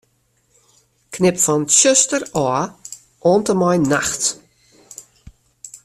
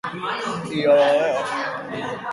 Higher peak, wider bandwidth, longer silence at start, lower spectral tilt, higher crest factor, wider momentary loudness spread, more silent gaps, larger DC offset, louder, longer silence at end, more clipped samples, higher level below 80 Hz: first, 0 dBFS vs -6 dBFS; first, 14 kHz vs 11.5 kHz; first, 1.1 s vs 0.05 s; second, -3.5 dB/octave vs -5 dB/octave; about the same, 20 dB vs 16 dB; first, 24 LU vs 12 LU; neither; neither; first, -16 LUFS vs -21 LUFS; about the same, 0.1 s vs 0 s; neither; first, -54 dBFS vs -64 dBFS